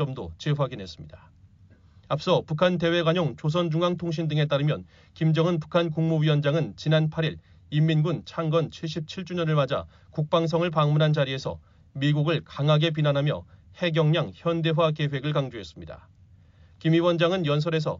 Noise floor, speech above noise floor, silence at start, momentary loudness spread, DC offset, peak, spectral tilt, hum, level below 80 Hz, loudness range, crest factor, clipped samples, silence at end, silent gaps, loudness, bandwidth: -55 dBFS; 30 dB; 0 s; 11 LU; under 0.1%; -8 dBFS; -6 dB/octave; none; -58 dBFS; 2 LU; 18 dB; under 0.1%; 0 s; none; -25 LUFS; 7.4 kHz